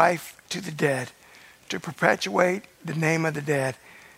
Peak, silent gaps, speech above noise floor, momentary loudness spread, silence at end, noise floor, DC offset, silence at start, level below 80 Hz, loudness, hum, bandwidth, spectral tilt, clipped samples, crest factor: -2 dBFS; none; 26 dB; 11 LU; 0.15 s; -51 dBFS; under 0.1%; 0 s; -68 dBFS; -26 LUFS; none; 16 kHz; -5 dB/octave; under 0.1%; 24 dB